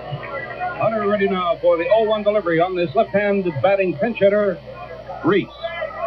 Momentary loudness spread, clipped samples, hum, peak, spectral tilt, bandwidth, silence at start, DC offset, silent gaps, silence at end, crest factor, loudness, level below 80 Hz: 12 LU; under 0.1%; none; -4 dBFS; -9 dB/octave; 5.8 kHz; 0 s; under 0.1%; none; 0 s; 16 dB; -19 LUFS; -50 dBFS